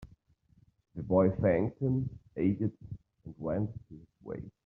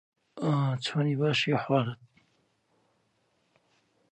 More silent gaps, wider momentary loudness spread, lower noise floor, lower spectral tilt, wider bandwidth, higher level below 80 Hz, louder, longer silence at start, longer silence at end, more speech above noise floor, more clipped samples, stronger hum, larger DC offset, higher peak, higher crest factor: neither; first, 21 LU vs 8 LU; second, -67 dBFS vs -72 dBFS; first, -10.5 dB/octave vs -6.5 dB/octave; second, 3.8 kHz vs 9.4 kHz; first, -58 dBFS vs -74 dBFS; second, -31 LUFS vs -28 LUFS; second, 0 s vs 0.35 s; second, 0.15 s vs 2.15 s; second, 35 dB vs 45 dB; neither; neither; neither; about the same, -12 dBFS vs -12 dBFS; about the same, 20 dB vs 20 dB